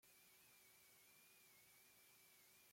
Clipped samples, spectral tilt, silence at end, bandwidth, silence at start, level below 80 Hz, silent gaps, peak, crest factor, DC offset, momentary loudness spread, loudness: under 0.1%; -0.5 dB/octave; 0 s; 16.5 kHz; 0 s; under -90 dBFS; none; -58 dBFS; 12 dB; under 0.1%; 0 LU; -68 LUFS